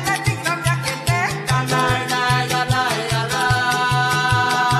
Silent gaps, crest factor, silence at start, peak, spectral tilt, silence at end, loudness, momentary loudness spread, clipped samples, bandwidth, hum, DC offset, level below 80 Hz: none; 16 dB; 0 s; -2 dBFS; -4 dB/octave; 0 s; -18 LUFS; 4 LU; under 0.1%; 14 kHz; none; under 0.1%; -40 dBFS